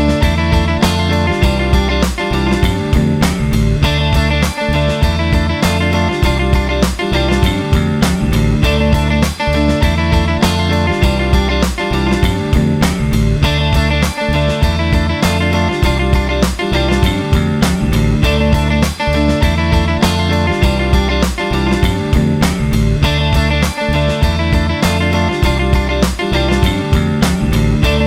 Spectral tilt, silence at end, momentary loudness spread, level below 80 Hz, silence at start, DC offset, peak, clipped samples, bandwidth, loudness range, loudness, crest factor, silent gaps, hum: -6 dB/octave; 0 s; 2 LU; -18 dBFS; 0 s; under 0.1%; 0 dBFS; under 0.1%; 16.5 kHz; 1 LU; -14 LUFS; 12 dB; none; none